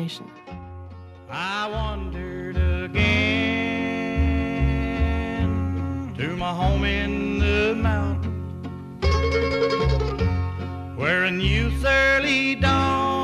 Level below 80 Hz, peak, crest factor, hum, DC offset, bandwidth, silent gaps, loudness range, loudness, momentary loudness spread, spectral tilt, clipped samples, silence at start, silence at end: -30 dBFS; -6 dBFS; 16 dB; none; under 0.1%; 11 kHz; none; 3 LU; -23 LUFS; 13 LU; -6.5 dB/octave; under 0.1%; 0 s; 0 s